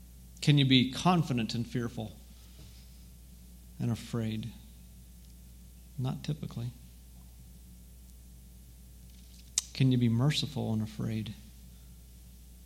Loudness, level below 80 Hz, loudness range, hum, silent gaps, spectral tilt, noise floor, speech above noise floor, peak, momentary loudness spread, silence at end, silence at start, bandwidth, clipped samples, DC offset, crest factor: -31 LUFS; -52 dBFS; 12 LU; none; none; -5 dB/octave; -52 dBFS; 22 dB; -8 dBFS; 26 LU; 0 s; 0 s; 16.5 kHz; under 0.1%; under 0.1%; 26 dB